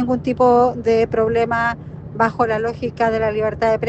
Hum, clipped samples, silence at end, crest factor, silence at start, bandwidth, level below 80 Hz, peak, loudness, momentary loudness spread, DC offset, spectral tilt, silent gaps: none; under 0.1%; 0 s; 14 dB; 0 s; 8.2 kHz; -46 dBFS; -4 dBFS; -18 LUFS; 7 LU; under 0.1%; -7 dB/octave; none